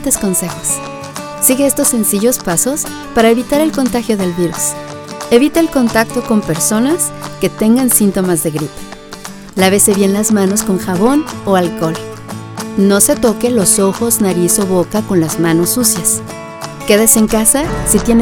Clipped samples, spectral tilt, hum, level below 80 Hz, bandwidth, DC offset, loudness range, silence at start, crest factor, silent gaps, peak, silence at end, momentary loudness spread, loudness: under 0.1%; -4 dB/octave; none; -36 dBFS; over 20 kHz; under 0.1%; 2 LU; 0 s; 12 dB; none; 0 dBFS; 0 s; 15 LU; -12 LUFS